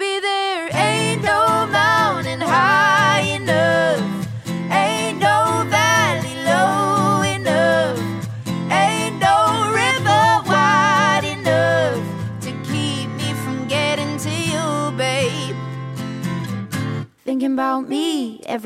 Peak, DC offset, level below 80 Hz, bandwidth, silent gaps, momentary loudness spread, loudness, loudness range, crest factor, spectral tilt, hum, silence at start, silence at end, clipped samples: -4 dBFS; under 0.1%; -56 dBFS; 16 kHz; none; 11 LU; -18 LUFS; 7 LU; 14 dB; -4.5 dB/octave; none; 0 s; 0 s; under 0.1%